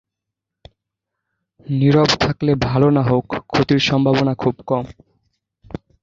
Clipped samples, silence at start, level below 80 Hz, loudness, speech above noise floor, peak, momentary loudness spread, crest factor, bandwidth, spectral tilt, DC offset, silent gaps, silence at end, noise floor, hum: under 0.1%; 1.7 s; -44 dBFS; -17 LUFS; 66 dB; -2 dBFS; 14 LU; 18 dB; 7.6 kHz; -6.5 dB/octave; under 0.1%; none; 0.3 s; -82 dBFS; none